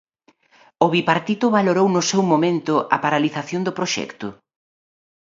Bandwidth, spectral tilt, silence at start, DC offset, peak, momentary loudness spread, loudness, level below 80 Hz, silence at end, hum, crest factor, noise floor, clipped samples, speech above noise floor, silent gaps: 7.8 kHz; -5 dB/octave; 0.8 s; under 0.1%; 0 dBFS; 8 LU; -19 LUFS; -66 dBFS; 0.85 s; none; 20 dB; -59 dBFS; under 0.1%; 40 dB; none